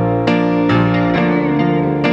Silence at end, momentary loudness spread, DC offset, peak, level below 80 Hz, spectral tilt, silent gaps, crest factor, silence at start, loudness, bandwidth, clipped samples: 0 s; 1 LU; under 0.1%; -2 dBFS; -40 dBFS; -8.5 dB/octave; none; 12 dB; 0 s; -15 LUFS; 6.8 kHz; under 0.1%